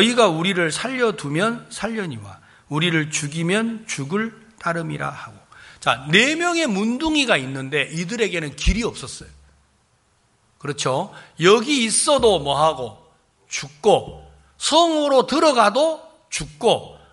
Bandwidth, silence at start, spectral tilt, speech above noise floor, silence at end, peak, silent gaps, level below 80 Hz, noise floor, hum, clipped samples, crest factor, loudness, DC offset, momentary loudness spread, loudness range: 11.5 kHz; 0 s; -3.5 dB/octave; 42 dB; 0.15 s; 0 dBFS; none; -38 dBFS; -62 dBFS; none; under 0.1%; 20 dB; -20 LUFS; under 0.1%; 14 LU; 6 LU